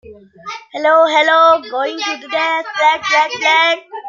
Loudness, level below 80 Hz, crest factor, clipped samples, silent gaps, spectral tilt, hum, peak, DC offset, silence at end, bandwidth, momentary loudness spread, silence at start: -13 LUFS; -64 dBFS; 14 dB; under 0.1%; none; -1 dB/octave; none; -2 dBFS; under 0.1%; 0 s; 7.6 kHz; 14 LU; 0.05 s